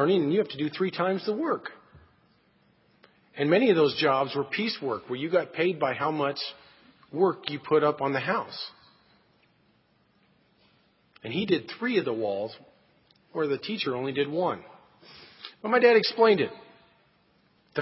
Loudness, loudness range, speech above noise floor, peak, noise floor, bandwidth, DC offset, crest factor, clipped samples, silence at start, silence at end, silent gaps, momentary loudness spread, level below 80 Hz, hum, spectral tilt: -26 LUFS; 7 LU; 40 dB; -8 dBFS; -66 dBFS; 5.8 kHz; under 0.1%; 22 dB; under 0.1%; 0 s; 0 s; none; 15 LU; -72 dBFS; none; -9.5 dB/octave